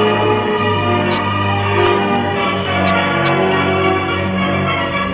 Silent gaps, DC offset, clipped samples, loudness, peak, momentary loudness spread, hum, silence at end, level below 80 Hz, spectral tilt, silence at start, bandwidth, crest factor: none; under 0.1%; under 0.1%; -15 LUFS; -2 dBFS; 3 LU; none; 0 s; -36 dBFS; -10 dB/octave; 0 s; 4 kHz; 12 dB